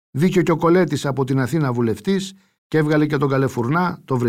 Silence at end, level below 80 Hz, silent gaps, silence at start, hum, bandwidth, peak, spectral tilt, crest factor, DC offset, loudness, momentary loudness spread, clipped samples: 0 s; -56 dBFS; 2.58-2.70 s; 0.15 s; none; 15.5 kHz; -6 dBFS; -7 dB/octave; 14 dB; under 0.1%; -19 LUFS; 6 LU; under 0.1%